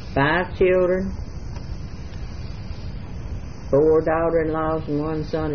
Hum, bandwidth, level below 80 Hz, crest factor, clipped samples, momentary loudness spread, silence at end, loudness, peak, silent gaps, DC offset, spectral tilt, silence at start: none; 6.6 kHz; -34 dBFS; 16 dB; under 0.1%; 17 LU; 0 s; -21 LUFS; -6 dBFS; none; 1%; -8 dB/octave; 0 s